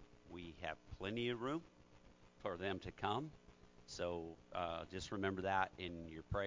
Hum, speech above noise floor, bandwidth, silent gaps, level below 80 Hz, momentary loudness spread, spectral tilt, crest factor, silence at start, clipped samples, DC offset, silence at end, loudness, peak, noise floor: none; 21 dB; 7.6 kHz; none; -62 dBFS; 14 LU; -5.5 dB/octave; 22 dB; 0 s; under 0.1%; under 0.1%; 0 s; -45 LUFS; -22 dBFS; -65 dBFS